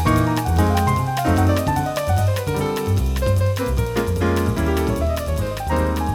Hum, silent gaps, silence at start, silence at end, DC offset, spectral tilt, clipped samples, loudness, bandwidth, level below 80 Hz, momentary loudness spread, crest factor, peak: none; none; 0 s; 0 s; under 0.1%; -6.5 dB/octave; under 0.1%; -20 LUFS; 18 kHz; -28 dBFS; 4 LU; 14 dB; -4 dBFS